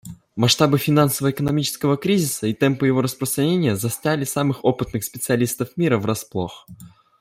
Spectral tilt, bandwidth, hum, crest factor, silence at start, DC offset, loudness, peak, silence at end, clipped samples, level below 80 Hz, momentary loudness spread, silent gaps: -5 dB/octave; 16 kHz; none; 18 dB; 0.05 s; under 0.1%; -20 LUFS; -2 dBFS; 0.35 s; under 0.1%; -54 dBFS; 9 LU; none